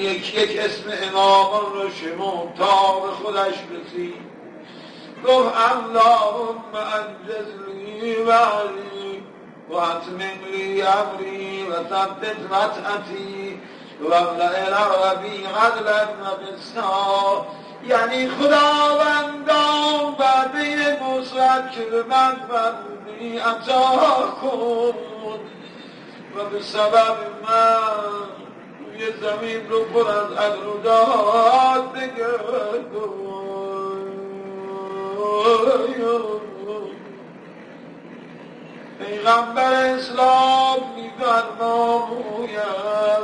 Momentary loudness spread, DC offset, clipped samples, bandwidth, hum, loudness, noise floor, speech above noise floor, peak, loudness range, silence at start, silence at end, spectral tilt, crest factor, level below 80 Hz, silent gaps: 19 LU; under 0.1%; under 0.1%; 10.5 kHz; none; -20 LUFS; -41 dBFS; 21 dB; -4 dBFS; 5 LU; 0 s; 0 s; -3.5 dB/octave; 18 dB; -66 dBFS; none